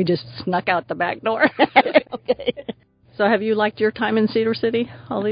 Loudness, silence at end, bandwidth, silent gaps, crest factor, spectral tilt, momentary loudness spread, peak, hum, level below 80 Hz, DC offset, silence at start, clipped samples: -20 LUFS; 0 s; 5.2 kHz; none; 20 dB; -10.5 dB/octave; 9 LU; 0 dBFS; none; -58 dBFS; under 0.1%; 0 s; under 0.1%